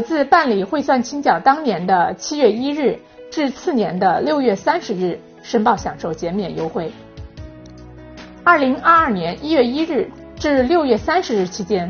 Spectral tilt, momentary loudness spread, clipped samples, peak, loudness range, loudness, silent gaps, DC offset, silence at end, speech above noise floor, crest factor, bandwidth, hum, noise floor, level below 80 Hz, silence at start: -4 dB/octave; 15 LU; under 0.1%; 0 dBFS; 6 LU; -17 LUFS; none; under 0.1%; 0 s; 21 dB; 18 dB; 6.8 kHz; none; -38 dBFS; -46 dBFS; 0 s